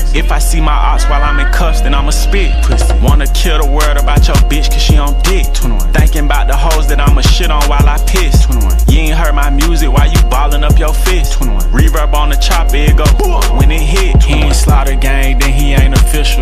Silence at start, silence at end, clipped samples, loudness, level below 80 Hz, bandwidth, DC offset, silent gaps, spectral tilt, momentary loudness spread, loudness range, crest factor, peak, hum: 0 s; 0 s; under 0.1%; -11 LUFS; -8 dBFS; 15.5 kHz; under 0.1%; none; -4.5 dB/octave; 3 LU; 1 LU; 8 dB; 0 dBFS; none